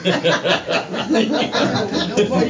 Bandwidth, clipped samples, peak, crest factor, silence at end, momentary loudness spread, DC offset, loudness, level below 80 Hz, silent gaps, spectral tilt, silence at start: 7.6 kHz; under 0.1%; -2 dBFS; 16 dB; 0 s; 3 LU; under 0.1%; -18 LUFS; -50 dBFS; none; -4.5 dB/octave; 0 s